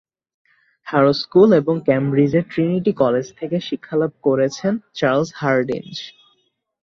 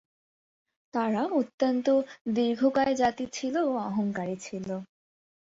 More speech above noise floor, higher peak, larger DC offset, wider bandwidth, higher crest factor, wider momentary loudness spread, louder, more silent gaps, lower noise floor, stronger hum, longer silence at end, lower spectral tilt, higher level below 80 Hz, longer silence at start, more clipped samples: second, 48 dB vs over 63 dB; first, -2 dBFS vs -12 dBFS; neither; about the same, 7.4 kHz vs 7.8 kHz; about the same, 16 dB vs 16 dB; about the same, 11 LU vs 10 LU; first, -18 LUFS vs -28 LUFS; second, none vs 1.54-1.58 s, 2.21-2.25 s; second, -66 dBFS vs under -90 dBFS; neither; first, 0.75 s vs 0.55 s; first, -7 dB/octave vs -5.5 dB/octave; first, -58 dBFS vs -68 dBFS; about the same, 0.85 s vs 0.95 s; neither